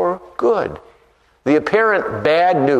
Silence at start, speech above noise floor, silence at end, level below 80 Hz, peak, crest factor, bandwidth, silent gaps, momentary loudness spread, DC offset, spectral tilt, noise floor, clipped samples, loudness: 0 s; 40 dB; 0 s; -52 dBFS; -2 dBFS; 14 dB; 9.2 kHz; none; 12 LU; under 0.1%; -6.5 dB/octave; -55 dBFS; under 0.1%; -17 LUFS